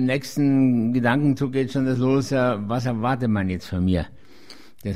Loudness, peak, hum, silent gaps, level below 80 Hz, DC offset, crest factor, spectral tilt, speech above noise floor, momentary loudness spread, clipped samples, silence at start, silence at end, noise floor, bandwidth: -22 LUFS; -8 dBFS; none; none; -46 dBFS; 0.7%; 14 dB; -7.5 dB/octave; 27 dB; 6 LU; under 0.1%; 0 s; 0 s; -48 dBFS; 14.5 kHz